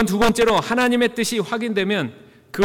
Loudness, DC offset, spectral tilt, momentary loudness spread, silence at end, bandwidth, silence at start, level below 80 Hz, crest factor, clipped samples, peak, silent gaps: -19 LUFS; under 0.1%; -4.5 dB/octave; 7 LU; 0 s; 18.5 kHz; 0 s; -46 dBFS; 10 dB; under 0.1%; -8 dBFS; none